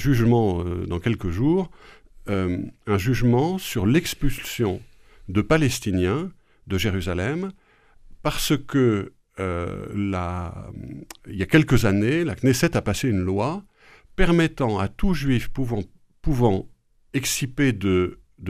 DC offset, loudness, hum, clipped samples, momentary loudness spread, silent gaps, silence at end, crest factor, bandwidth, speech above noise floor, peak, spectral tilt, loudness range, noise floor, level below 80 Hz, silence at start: under 0.1%; -23 LUFS; none; under 0.1%; 12 LU; none; 0 s; 20 dB; 15.5 kHz; 28 dB; -2 dBFS; -6 dB/octave; 4 LU; -50 dBFS; -36 dBFS; 0 s